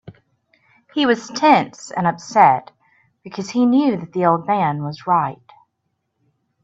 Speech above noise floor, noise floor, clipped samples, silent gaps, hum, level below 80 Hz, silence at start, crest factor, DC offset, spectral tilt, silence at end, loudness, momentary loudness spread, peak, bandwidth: 56 dB; -73 dBFS; under 0.1%; none; none; -64 dBFS; 0.05 s; 20 dB; under 0.1%; -5.5 dB/octave; 1.3 s; -18 LUFS; 12 LU; 0 dBFS; 8 kHz